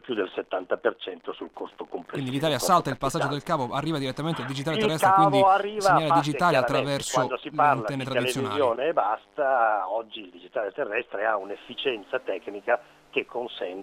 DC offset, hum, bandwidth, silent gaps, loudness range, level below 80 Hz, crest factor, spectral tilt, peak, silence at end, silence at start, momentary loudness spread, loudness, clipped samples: under 0.1%; none; 16.5 kHz; none; 7 LU; -58 dBFS; 18 dB; -4.5 dB/octave; -8 dBFS; 0 s; 0.05 s; 14 LU; -25 LUFS; under 0.1%